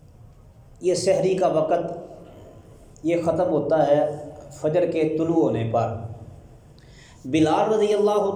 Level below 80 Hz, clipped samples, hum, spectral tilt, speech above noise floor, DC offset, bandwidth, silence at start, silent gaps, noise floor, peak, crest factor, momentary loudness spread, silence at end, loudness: -54 dBFS; under 0.1%; none; -6.5 dB/octave; 27 dB; under 0.1%; 11 kHz; 0.8 s; none; -48 dBFS; -8 dBFS; 16 dB; 16 LU; 0 s; -22 LUFS